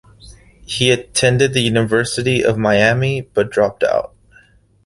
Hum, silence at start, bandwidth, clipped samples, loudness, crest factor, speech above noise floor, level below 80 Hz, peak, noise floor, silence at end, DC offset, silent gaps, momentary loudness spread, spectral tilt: none; 0.25 s; 12 kHz; under 0.1%; -16 LUFS; 16 dB; 35 dB; -46 dBFS; -2 dBFS; -50 dBFS; 0.8 s; under 0.1%; none; 5 LU; -4.5 dB/octave